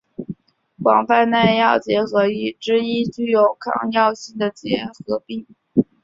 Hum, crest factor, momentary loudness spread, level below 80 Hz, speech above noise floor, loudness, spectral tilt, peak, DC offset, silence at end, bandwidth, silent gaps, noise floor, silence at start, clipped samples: none; 18 dB; 15 LU; -60 dBFS; 25 dB; -19 LUFS; -6 dB/octave; -2 dBFS; under 0.1%; 0.2 s; 7.6 kHz; none; -44 dBFS; 0.2 s; under 0.1%